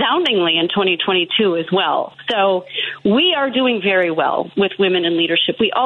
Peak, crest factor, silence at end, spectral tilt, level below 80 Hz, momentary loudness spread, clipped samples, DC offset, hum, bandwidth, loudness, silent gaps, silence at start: -6 dBFS; 10 dB; 0 s; -6.5 dB/octave; -60 dBFS; 5 LU; under 0.1%; under 0.1%; none; 6.2 kHz; -16 LUFS; none; 0 s